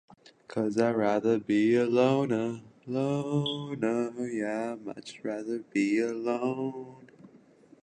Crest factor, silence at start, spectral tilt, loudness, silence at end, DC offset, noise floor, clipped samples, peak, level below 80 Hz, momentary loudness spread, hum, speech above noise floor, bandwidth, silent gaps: 18 dB; 0.5 s; -6.5 dB/octave; -29 LUFS; 0.45 s; under 0.1%; -57 dBFS; under 0.1%; -12 dBFS; -72 dBFS; 13 LU; none; 29 dB; 9.8 kHz; none